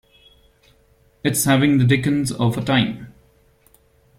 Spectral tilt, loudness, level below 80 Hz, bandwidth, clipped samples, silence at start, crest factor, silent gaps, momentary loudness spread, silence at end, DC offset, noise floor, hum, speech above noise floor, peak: -5 dB/octave; -18 LUFS; -50 dBFS; 16.5 kHz; under 0.1%; 1.25 s; 18 dB; none; 10 LU; 1.1 s; under 0.1%; -57 dBFS; none; 39 dB; -4 dBFS